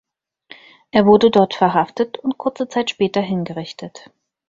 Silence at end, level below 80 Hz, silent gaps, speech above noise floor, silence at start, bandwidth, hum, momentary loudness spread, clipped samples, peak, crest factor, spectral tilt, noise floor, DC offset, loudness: 0.5 s; -58 dBFS; none; 30 dB; 0.95 s; 7.6 kHz; none; 17 LU; under 0.1%; -2 dBFS; 18 dB; -6.5 dB/octave; -47 dBFS; under 0.1%; -17 LUFS